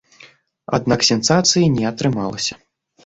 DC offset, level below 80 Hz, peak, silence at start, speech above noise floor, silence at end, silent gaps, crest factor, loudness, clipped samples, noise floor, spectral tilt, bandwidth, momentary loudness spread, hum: under 0.1%; -50 dBFS; -2 dBFS; 0.2 s; 31 dB; 0.5 s; none; 18 dB; -17 LUFS; under 0.1%; -48 dBFS; -4 dB/octave; 8.2 kHz; 9 LU; none